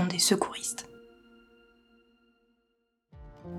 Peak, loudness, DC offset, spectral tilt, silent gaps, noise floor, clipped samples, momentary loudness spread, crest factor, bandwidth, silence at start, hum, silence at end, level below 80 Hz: -10 dBFS; -28 LUFS; under 0.1%; -3 dB/octave; none; -77 dBFS; under 0.1%; 25 LU; 24 dB; 19 kHz; 0 s; none; 0 s; -62 dBFS